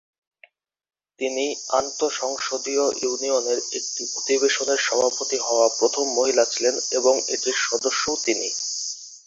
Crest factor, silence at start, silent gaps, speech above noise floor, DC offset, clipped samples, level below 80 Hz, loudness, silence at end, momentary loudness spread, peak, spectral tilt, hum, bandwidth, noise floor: 18 dB; 1.2 s; none; 34 dB; under 0.1%; under 0.1%; -68 dBFS; -22 LUFS; 0.1 s; 6 LU; -4 dBFS; 0 dB/octave; none; 8 kHz; -57 dBFS